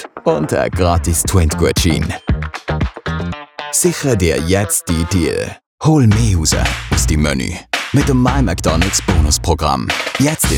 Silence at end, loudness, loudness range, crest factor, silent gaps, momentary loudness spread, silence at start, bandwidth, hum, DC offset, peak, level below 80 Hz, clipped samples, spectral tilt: 0 s; -15 LUFS; 2 LU; 14 dB; 5.66-5.78 s; 7 LU; 0 s; 19.5 kHz; none; under 0.1%; 0 dBFS; -24 dBFS; under 0.1%; -4.5 dB/octave